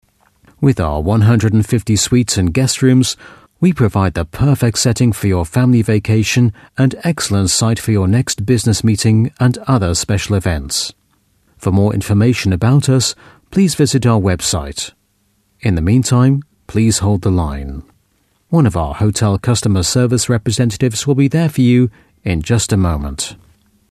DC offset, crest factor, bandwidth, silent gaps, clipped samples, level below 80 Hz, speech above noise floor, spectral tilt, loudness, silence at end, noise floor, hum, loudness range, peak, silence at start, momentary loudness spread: under 0.1%; 14 dB; 14 kHz; none; under 0.1%; -32 dBFS; 47 dB; -5.5 dB/octave; -14 LUFS; 0.55 s; -60 dBFS; none; 2 LU; 0 dBFS; 0.6 s; 8 LU